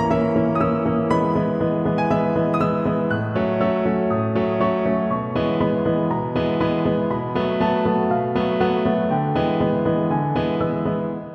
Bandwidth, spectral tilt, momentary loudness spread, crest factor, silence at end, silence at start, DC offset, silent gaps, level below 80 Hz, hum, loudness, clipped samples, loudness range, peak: 8.4 kHz; -9 dB/octave; 3 LU; 14 dB; 0 s; 0 s; under 0.1%; none; -46 dBFS; none; -21 LUFS; under 0.1%; 1 LU; -6 dBFS